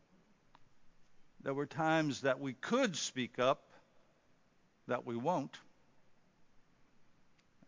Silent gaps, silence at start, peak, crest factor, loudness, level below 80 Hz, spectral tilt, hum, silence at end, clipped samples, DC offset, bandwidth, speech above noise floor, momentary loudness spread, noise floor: none; 0.6 s; -18 dBFS; 22 dB; -36 LUFS; -80 dBFS; -4.5 dB/octave; none; 0.65 s; under 0.1%; under 0.1%; 7.6 kHz; 35 dB; 11 LU; -70 dBFS